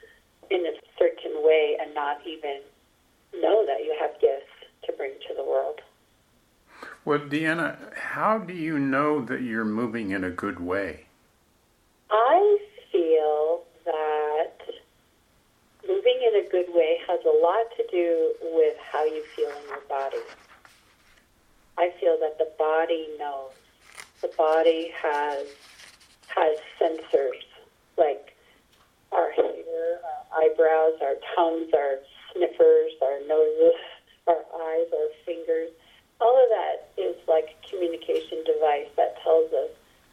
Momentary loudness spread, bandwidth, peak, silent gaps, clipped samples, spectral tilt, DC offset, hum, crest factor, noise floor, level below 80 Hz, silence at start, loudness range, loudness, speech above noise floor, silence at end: 14 LU; 10.5 kHz; -6 dBFS; none; under 0.1%; -6 dB/octave; under 0.1%; none; 18 dB; -64 dBFS; -68 dBFS; 0.5 s; 6 LU; -25 LUFS; 40 dB; 0.4 s